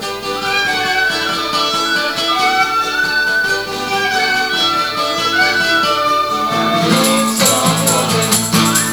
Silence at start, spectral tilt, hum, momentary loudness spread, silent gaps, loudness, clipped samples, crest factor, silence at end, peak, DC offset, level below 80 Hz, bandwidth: 0 s; -2.5 dB/octave; none; 4 LU; none; -13 LUFS; under 0.1%; 14 dB; 0 s; 0 dBFS; under 0.1%; -46 dBFS; over 20 kHz